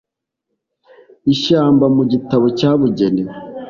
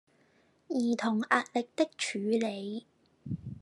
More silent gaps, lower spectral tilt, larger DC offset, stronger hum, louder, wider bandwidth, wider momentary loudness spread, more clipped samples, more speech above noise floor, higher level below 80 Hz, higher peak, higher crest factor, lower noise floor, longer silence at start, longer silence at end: neither; first, -7.5 dB/octave vs -4.5 dB/octave; neither; neither; first, -14 LUFS vs -32 LUFS; second, 7.2 kHz vs 11.5 kHz; second, 8 LU vs 13 LU; neither; first, 63 dB vs 37 dB; first, -52 dBFS vs -70 dBFS; first, -2 dBFS vs -10 dBFS; second, 14 dB vs 22 dB; first, -76 dBFS vs -67 dBFS; first, 1.25 s vs 0.7 s; about the same, 0 s vs 0 s